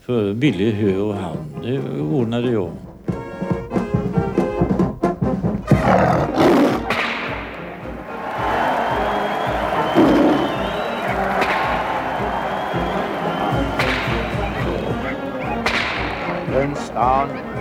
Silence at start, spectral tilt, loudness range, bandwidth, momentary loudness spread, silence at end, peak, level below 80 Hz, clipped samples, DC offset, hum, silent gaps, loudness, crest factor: 0.1 s; -6.5 dB/octave; 4 LU; 16.5 kHz; 10 LU; 0 s; -2 dBFS; -36 dBFS; under 0.1%; under 0.1%; none; none; -20 LUFS; 18 dB